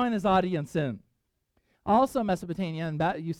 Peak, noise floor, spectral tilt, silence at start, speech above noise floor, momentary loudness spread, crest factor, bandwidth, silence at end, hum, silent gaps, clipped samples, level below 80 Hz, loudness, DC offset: -12 dBFS; -76 dBFS; -7 dB/octave; 0 s; 49 dB; 10 LU; 16 dB; 15 kHz; 0.05 s; none; none; under 0.1%; -56 dBFS; -27 LUFS; under 0.1%